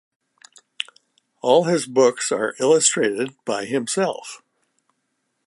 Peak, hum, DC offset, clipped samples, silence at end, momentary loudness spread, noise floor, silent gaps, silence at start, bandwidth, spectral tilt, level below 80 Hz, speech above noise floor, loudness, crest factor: -2 dBFS; none; under 0.1%; under 0.1%; 1.1 s; 16 LU; -73 dBFS; none; 1.45 s; 11.5 kHz; -3 dB/octave; -76 dBFS; 54 dB; -20 LUFS; 20 dB